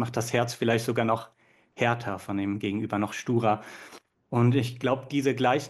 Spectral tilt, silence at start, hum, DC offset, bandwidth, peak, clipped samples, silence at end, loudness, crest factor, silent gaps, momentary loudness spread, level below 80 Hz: -6 dB/octave; 0 s; none; under 0.1%; 12.5 kHz; -10 dBFS; under 0.1%; 0 s; -27 LUFS; 18 dB; none; 7 LU; -68 dBFS